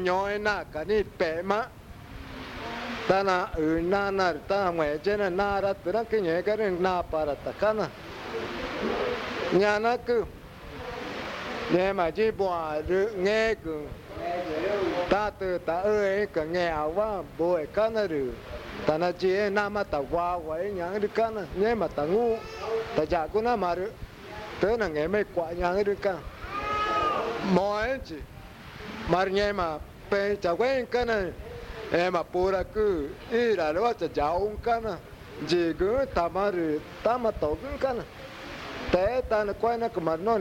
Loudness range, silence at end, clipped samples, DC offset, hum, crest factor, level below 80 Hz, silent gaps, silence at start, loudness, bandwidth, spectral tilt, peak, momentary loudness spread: 2 LU; 0 s; under 0.1%; under 0.1%; none; 20 dB; -48 dBFS; none; 0 s; -28 LUFS; 16.5 kHz; -6 dB/octave; -8 dBFS; 12 LU